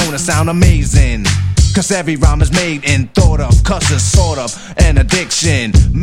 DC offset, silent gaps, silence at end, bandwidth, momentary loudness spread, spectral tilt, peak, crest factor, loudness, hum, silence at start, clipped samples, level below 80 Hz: under 0.1%; none; 0 s; 15.5 kHz; 3 LU; -4.5 dB/octave; 0 dBFS; 10 dB; -12 LUFS; none; 0 s; 0.3%; -14 dBFS